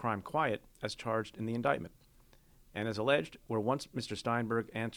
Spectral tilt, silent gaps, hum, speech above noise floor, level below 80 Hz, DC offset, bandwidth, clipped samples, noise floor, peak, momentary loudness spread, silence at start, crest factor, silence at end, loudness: -5.5 dB/octave; none; none; 28 dB; -64 dBFS; under 0.1%; 20 kHz; under 0.1%; -63 dBFS; -16 dBFS; 8 LU; 0 s; 20 dB; 0 s; -35 LUFS